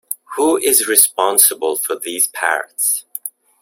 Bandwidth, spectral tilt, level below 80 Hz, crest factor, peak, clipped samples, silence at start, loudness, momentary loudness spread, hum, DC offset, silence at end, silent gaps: over 20 kHz; 0.5 dB/octave; -66 dBFS; 18 dB; 0 dBFS; under 0.1%; 0.1 s; -14 LUFS; 14 LU; none; under 0.1%; 0.35 s; none